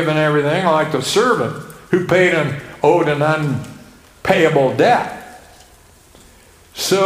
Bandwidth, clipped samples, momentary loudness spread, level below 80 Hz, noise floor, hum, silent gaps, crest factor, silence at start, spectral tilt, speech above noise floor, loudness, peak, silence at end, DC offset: 16 kHz; under 0.1%; 12 LU; -52 dBFS; -47 dBFS; none; none; 16 dB; 0 s; -5 dB/octave; 32 dB; -16 LUFS; 0 dBFS; 0 s; under 0.1%